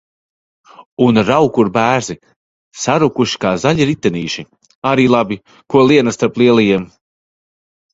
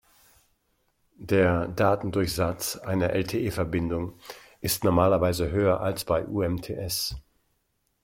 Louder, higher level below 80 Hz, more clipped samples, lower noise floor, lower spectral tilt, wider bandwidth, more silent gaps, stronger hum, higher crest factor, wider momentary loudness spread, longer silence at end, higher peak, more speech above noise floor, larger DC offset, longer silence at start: first, -14 LUFS vs -26 LUFS; about the same, -50 dBFS vs -48 dBFS; neither; first, under -90 dBFS vs -74 dBFS; about the same, -5.5 dB/octave vs -5.5 dB/octave; second, 8 kHz vs 16.5 kHz; first, 0.86-0.97 s, 2.36-2.71 s, 4.75-4.82 s vs none; neither; second, 14 dB vs 20 dB; about the same, 12 LU vs 10 LU; first, 1.05 s vs 0.85 s; first, 0 dBFS vs -6 dBFS; first, over 77 dB vs 48 dB; neither; second, 0.8 s vs 1.2 s